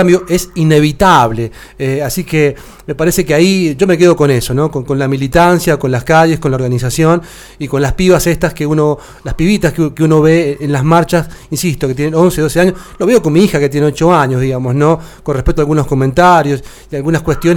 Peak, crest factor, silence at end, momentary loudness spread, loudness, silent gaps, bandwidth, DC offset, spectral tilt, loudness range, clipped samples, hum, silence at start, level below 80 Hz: 0 dBFS; 10 dB; 0 s; 9 LU; -11 LUFS; none; 18.5 kHz; under 0.1%; -6 dB/octave; 2 LU; 0.1%; none; 0 s; -30 dBFS